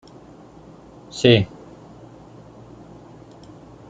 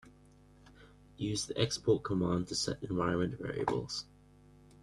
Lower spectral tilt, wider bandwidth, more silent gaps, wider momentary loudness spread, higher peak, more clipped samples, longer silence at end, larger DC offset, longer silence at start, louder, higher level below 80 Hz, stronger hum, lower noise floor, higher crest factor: about the same, -6 dB/octave vs -5 dB/octave; second, 9 kHz vs 12.5 kHz; neither; first, 29 LU vs 9 LU; first, -2 dBFS vs -14 dBFS; neither; first, 2.45 s vs 0.8 s; neither; first, 1.15 s vs 0.05 s; first, -18 LUFS vs -34 LUFS; first, -54 dBFS vs -60 dBFS; neither; second, -45 dBFS vs -60 dBFS; about the same, 24 dB vs 20 dB